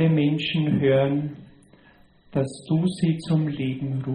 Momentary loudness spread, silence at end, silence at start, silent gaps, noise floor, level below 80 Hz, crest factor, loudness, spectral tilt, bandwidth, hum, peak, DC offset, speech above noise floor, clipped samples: 8 LU; 0 s; 0 s; none; -55 dBFS; -58 dBFS; 14 dB; -24 LUFS; -7.5 dB/octave; 9.8 kHz; none; -10 dBFS; under 0.1%; 32 dB; under 0.1%